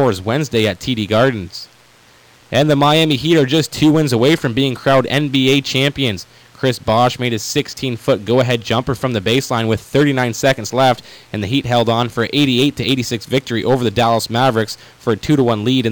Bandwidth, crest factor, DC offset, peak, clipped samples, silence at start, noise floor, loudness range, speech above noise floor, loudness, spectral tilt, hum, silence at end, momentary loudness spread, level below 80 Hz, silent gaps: 19.5 kHz; 12 dB; under 0.1%; -4 dBFS; under 0.1%; 0 s; -48 dBFS; 3 LU; 32 dB; -16 LUFS; -5.5 dB/octave; none; 0 s; 7 LU; -46 dBFS; none